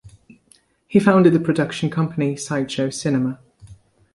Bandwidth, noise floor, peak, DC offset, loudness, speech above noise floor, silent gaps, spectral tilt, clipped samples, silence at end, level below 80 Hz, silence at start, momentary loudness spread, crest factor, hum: 11.5 kHz; -57 dBFS; -2 dBFS; under 0.1%; -19 LUFS; 39 dB; none; -6.5 dB/octave; under 0.1%; 0.4 s; -56 dBFS; 0.05 s; 10 LU; 18 dB; none